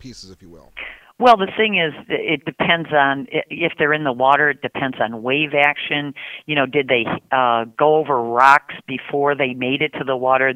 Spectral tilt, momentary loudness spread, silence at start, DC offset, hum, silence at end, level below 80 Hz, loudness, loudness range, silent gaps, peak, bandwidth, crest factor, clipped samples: -5.5 dB/octave; 10 LU; 0.05 s; under 0.1%; none; 0 s; -60 dBFS; -17 LUFS; 1 LU; none; 0 dBFS; 12.5 kHz; 18 dB; under 0.1%